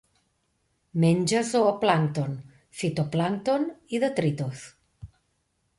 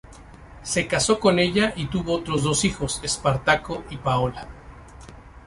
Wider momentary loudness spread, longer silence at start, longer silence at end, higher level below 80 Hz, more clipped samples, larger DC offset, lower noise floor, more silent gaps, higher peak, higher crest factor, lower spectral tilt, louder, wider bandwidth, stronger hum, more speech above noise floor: about the same, 12 LU vs 10 LU; first, 0.95 s vs 0.05 s; first, 0.7 s vs 0 s; second, -62 dBFS vs -42 dBFS; neither; neither; first, -73 dBFS vs -44 dBFS; neither; second, -8 dBFS vs -4 dBFS; about the same, 20 dB vs 20 dB; first, -6 dB/octave vs -4 dB/octave; second, -26 LUFS vs -23 LUFS; about the same, 11.5 kHz vs 11.5 kHz; neither; first, 48 dB vs 21 dB